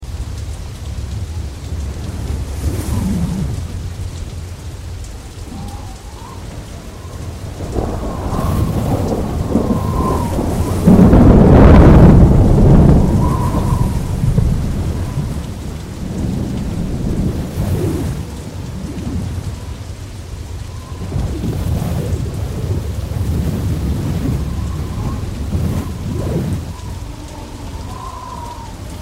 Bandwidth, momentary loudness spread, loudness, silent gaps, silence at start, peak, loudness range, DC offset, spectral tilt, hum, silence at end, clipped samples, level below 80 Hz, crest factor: 16 kHz; 20 LU; -16 LUFS; none; 0 s; 0 dBFS; 16 LU; under 0.1%; -8 dB/octave; none; 0 s; 0.1%; -20 dBFS; 16 dB